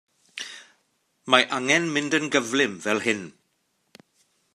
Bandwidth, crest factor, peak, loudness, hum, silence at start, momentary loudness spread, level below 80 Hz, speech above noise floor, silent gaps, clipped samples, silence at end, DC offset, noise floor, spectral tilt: 14.5 kHz; 26 dB; 0 dBFS; -22 LUFS; none; 0.35 s; 22 LU; -76 dBFS; 49 dB; none; under 0.1%; 1.25 s; under 0.1%; -72 dBFS; -3 dB/octave